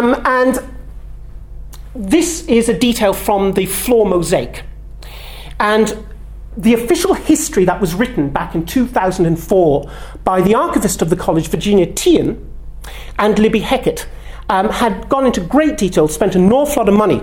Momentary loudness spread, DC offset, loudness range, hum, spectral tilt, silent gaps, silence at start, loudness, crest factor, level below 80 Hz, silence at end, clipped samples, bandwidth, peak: 19 LU; under 0.1%; 2 LU; none; -5 dB/octave; none; 0 s; -14 LUFS; 14 dB; -32 dBFS; 0 s; under 0.1%; 19 kHz; 0 dBFS